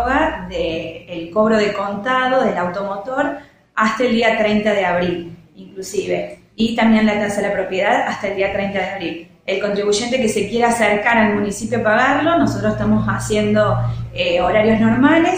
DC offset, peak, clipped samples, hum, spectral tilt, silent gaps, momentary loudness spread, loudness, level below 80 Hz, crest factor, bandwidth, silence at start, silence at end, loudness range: under 0.1%; -2 dBFS; under 0.1%; none; -5 dB/octave; none; 10 LU; -17 LUFS; -42 dBFS; 16 dB; 16 kHz; 0 s; 0 s; 3 LU